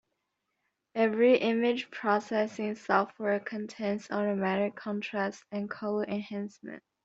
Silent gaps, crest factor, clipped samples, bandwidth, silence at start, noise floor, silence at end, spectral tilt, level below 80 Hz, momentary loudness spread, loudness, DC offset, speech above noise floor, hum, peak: none; 20 dB; under 0.1%; 7.8 kHz; 0.95 s; -82 dBFS; 0.25 s; -6 dB/octave; -76 dBFS; 13 LU; -30 LUFS; under 0.1%; 52 dB; none; -10 dBFS